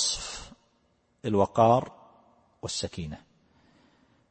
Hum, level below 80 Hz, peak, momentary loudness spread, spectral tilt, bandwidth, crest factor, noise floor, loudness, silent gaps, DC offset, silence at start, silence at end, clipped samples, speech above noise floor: none; -56 dBFS; -6 dBFS; 21 LU; -4.5 dB/octave; 8.8 kHz; 24 dB; -69 dBFS; -27 LUFS; none; under 0.1%; 0 s; 1.15 s; under 0.1%; 44 dB